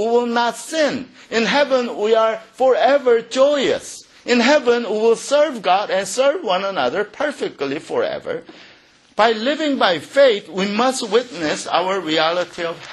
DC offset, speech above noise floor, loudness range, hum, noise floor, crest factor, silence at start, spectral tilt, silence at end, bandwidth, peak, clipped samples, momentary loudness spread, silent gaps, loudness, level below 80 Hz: under 0.1%; 32 dB; 5 LU; none; -50 dBFS; 18 dB; 0 s; -3.5 dB/octave; 0 s; 12 kHz; -2 dBFS; under 0.1%; 9 LU; none; -18 LUFS; -64 dBFS